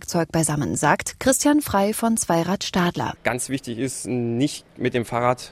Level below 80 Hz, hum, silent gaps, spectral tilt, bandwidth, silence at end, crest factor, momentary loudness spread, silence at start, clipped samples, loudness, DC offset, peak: -50 dBFS; none; none; -4.5 dB/octave; 16 kHz; 0 s; 18 dB; 7 LU; 0 s; under 0.1%; -22 LUFS; under 0.1%; -4 dBFS